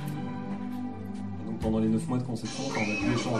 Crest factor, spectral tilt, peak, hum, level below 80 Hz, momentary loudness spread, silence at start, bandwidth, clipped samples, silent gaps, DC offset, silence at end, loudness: 16 dB; -6 dB/octave; -14 dBFS; none; -50 dBFS; 9 LU; 0 s; 13 kHz; under 0.1%; none; 0.6%; 0 s; -31 LUFS